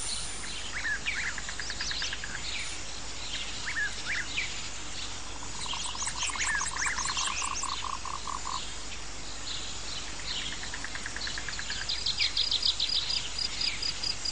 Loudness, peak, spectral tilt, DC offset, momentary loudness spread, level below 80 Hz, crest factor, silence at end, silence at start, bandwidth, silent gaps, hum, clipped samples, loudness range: -32 LUFS; -14 dBFS; 0 dB/octave; 1%; 10 LU; -48 dBFS; 20 dB; 0 s; 0 s; 10 kHz; none; none; under 0.1%; 6 LU